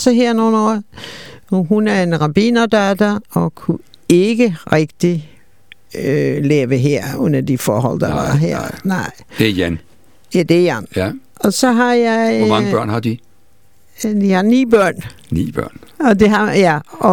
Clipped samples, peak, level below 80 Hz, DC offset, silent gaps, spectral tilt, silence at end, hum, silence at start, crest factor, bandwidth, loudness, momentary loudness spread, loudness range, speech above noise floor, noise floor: under 0.1%; 0 dBFS; -44 dBFS; 0.7%; none; -6 dB/octave; 0 s; none; 0 s; 14 dB; 18.5 kHz; -15 LUFS; 11 LU; 2 LU; 41 dB; -55 dBFS